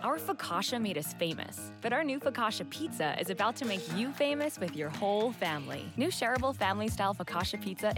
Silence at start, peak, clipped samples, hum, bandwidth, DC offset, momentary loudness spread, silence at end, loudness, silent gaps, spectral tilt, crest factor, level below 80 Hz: 0 s; -16 dBFS; under 0.1%; none; 18 kHz; under 0.1%; 6 LU; 0 s; -33 LUFS; none; -4 dB/octave; 16 dB; -58 dBFS